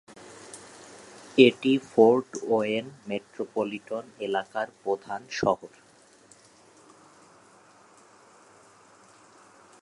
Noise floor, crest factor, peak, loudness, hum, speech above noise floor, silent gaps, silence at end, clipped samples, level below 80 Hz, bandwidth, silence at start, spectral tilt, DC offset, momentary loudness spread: -56 dBFS; 26 dB; -2 dBFS; -26 LUFS; none; 31 dB; none; 4.15 s; under 0.1%; -72 dBFS; 11.5 kHz; 0.55 s; -5 dB/octave; under 0.1%; 26 LU